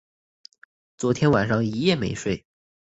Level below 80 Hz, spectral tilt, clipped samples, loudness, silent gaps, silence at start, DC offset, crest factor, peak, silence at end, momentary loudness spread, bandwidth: -52 dBFS; -6 dB/octave; under 0.1%; -23 LUFS; none; 1 s; under 0.1%; 20 dB; -6 dBFS; 0.5 s; 9 LU; 8.2 kHz